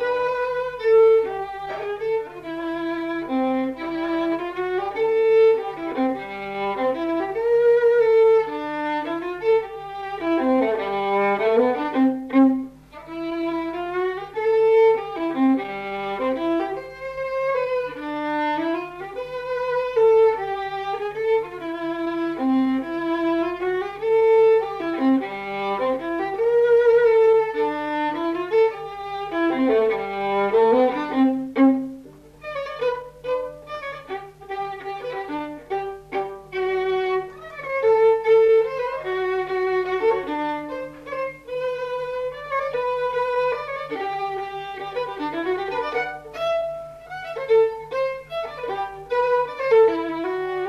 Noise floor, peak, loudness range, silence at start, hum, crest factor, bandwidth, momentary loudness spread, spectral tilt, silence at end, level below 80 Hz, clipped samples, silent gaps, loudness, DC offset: -43 dBFS; -6 dBFS; 7 LU; 0 s; none; 14 dB; 6.4 kHz; 14 LU; -6 dB/octave; 0 s; -56 dBFS; under 0.1%; none; -22 LUFS; under 0.1%